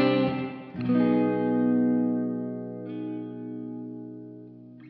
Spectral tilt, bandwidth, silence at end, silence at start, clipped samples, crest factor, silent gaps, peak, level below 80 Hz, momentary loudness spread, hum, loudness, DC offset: -6.5 dB/octave; 5 kHz; 0 s; 0 s; under 0.1%; 16 dB; none; -12 dBFS; -70 dBFS; 18 LU; none; -27 LUFS; under 0.1%